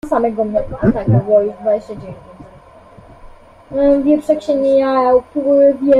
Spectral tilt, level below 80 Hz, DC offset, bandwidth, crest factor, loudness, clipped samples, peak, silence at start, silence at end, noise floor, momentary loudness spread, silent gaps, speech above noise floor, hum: -9 dB/octave; -40 dBFS; under 0.1%; 10 kHz; 14 dB; -14 LUFS; under 0.1%; -2 dBFS; 0.05 s; 0 s; -41 dBFS; 12 LU; none; 28 dB; none